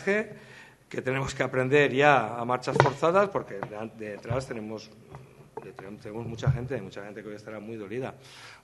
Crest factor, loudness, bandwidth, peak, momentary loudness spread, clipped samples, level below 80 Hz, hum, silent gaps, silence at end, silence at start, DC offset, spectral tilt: 28 dB; -27 LUFS; 12 kHz; 0 dBFS; 23 LU; under 0.1%; -56 dBFS; none; none; 0.05 s; 0 s; under 0.1%; -6 dB/octave